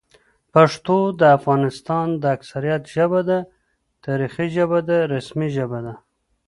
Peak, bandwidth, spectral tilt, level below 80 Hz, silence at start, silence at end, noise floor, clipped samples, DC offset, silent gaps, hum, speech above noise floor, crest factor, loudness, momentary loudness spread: 0 dBFS; 11.5 kHz; -7.5 dB/octave; -58 dBFS; 0.55 s; 0.5 s; -58 dBFS; under 0.1%; under 0.1%; none; none; 39 dB; 20 dB; -20 LUFS; 11 LU